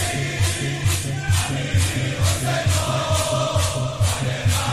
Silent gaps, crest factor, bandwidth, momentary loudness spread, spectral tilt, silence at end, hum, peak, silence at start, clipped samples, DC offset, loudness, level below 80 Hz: none; 12 dB; 15 kHz; 2 LU; -4 dB/octave; 0 s; none; -8 dBFS; 0 s; under 0.1%; under 0.1%; -21 LUFS; -30 dBFS